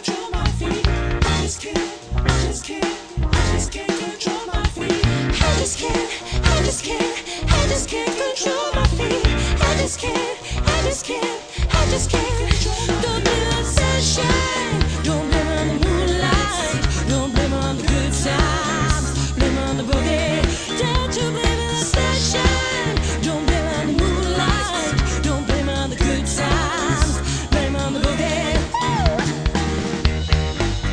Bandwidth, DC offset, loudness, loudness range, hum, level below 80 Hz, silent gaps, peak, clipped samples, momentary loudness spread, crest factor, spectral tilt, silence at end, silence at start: 11 kHz; under 0.1%; -20 LUFS; 2 LU; none; -24 dBFS; none; 0 dBFS; under 0.1%; 5 LU; 18 dB; -4.5 dB/octave; 0 s; 0 s